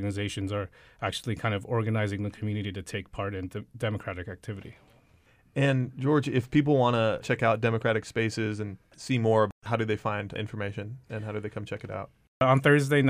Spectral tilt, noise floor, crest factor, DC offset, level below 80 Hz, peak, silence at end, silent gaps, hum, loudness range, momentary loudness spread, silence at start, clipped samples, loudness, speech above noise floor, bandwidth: -6.5 dB/octave; -61 dBFS; 18 dB; under 0.1%; -58 dBFS; -10 dBFS; 0 s; 9.52-9.61 s, 12.28-12.40 s; none; 7 LU; 15 LU; 0 s; under 0.1%; -28 LUFS; 34 dB; 15 kHz